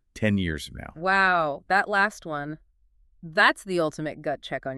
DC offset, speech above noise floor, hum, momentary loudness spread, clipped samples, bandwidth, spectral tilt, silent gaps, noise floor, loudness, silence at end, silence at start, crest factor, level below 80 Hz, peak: under 0.1%; 36 dB; none; 13 LU; under 0.1%; 13 kHz; -5 dB/octave; none; -62 dBFS; -24 LUFS; 0 s; 0.15 s; 22 dB; -50 dBFS; -4 dBFS